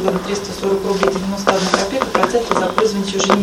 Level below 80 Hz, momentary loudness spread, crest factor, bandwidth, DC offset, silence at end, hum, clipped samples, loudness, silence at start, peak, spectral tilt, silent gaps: -42 dBFS; 4 LU; 16 dB; 16.5 kHz; under 0.1%; 0 s; none; under 0.1%; -17 LUFS; 0 s; 0 dBFS; -4 dB/octave; none